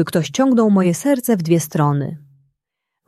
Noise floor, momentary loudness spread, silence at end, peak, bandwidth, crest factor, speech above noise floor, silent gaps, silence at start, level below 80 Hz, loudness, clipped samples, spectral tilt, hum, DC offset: -80 dBFS; 9 LU; 0.9 s; -2 dBFS; 15 kHz; 16 dB; 64 dB; none; 0 s; -60 dBFS; -17 LUFS; under 0.1%; -6.5 dB/octave; none; under 0.1%